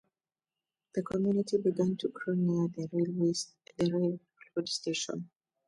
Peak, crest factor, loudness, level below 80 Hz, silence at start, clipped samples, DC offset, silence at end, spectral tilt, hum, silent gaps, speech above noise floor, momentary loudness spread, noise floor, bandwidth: -18 dBFS; 16 dB; -32 LUFS; -72 dBFS; 0.95 s; under 0.1%; under 0.1%; 0.4 s; -5.5 dB/octave; none; none; over 59 dB; 10 LU; under -90 dBFS; 11.5 kHz